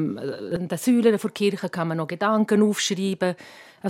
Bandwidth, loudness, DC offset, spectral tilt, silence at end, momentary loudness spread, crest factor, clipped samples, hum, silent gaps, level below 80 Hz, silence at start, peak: 16 kHz; -23 LUFS; under 0.1%; -5 dB/octave; 0 s; 10 LU; 16 dB; under 0.1%; none; none; -66 dBFS; 0 s; -6 dBFS